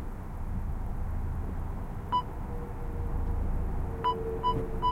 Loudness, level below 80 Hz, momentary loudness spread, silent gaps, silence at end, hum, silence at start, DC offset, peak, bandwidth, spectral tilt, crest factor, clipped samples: -34 LUFS; -34 dBFS; 8 LU; none; 0 s; none; 0 s; under 0.1%; -16 dBFS; 12.5 kHz; -7.5 dB/octave; 16 dB; under 0.1%